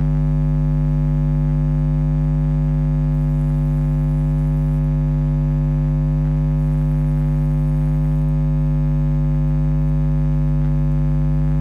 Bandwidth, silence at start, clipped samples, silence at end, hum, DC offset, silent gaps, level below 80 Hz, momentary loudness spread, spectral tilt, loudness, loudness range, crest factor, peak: 2.8 kHz; 0 s; under 0.1%; 0 s; none; under 0.1%; none; -22 dBFS; 0 LU; -11 dB/octave; -19 LUFS; 0 LU; 6 dB; -10 dBFS